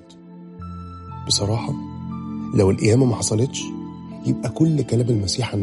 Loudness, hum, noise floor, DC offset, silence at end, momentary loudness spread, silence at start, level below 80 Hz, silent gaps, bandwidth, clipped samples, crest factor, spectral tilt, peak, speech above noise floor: -21 LUFS; none; -41 dBFS; under 0.1%; 0 s; 18 LU; 0 s; -48 dBFS; none; 11.5 kHz; under 0.1%; 16 dB; -5.5 dB/octave; -6 dBFS; 22 dB